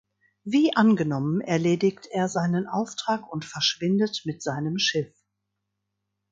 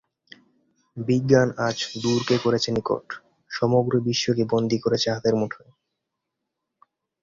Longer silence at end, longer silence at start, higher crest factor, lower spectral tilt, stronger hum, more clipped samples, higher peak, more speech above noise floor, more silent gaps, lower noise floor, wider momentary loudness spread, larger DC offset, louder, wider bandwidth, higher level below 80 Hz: second, 1.25 s vs 1.65 s; second, 0.45 s vs 0.95 s; about the same, 20 dB vs 22 dB; about the same, -5 dB/octave vs -5.5 dB/octave; neither; neither; second, -6 dBFS vs -2 dBFS; about the same, 56 dB vs 59 dB; neither; about the same, -81 dBFS vs -82 dBFS; second, 10 LU vs 14 LU; neither; about the same, -25 LUFS vs -23 LUFS; about the same, 7.8 kHz vs 7.6 kHz; second, -68 dBFS vs -58 dBFS